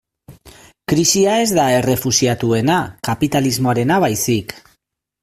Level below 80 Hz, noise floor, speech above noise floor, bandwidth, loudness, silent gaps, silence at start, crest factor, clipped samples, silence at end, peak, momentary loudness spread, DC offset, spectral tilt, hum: -48 dBFS; -67 dBFS; 51 dB; 16 kHz; -16 LUFS; none; 0.3 s; 16 dB; under 0.1%; 0.65 s; 0 dBFS; 6 LU; under 0.1%; -4 dB/octave; none